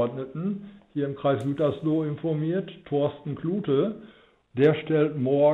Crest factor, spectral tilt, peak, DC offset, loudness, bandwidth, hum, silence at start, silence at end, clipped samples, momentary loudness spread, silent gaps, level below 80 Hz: 16 dB; -9.5 dB/octave; -8 dBFS; under 0.1%; -26 LUFS; 9.2 kHz; none; 0 s; 0 s; under 0.1%; 10 LU; none; -64 dBFS